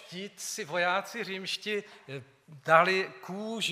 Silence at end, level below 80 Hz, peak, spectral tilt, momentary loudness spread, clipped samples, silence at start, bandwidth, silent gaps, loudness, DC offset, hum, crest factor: 0 s; -86 dBFS; -8 dBFS; -3 dB/octave; 20 LU; under 0.1%; 0 s; 15.5 kHz; none; -29 LUFS; under 0.1%; none; 24 dB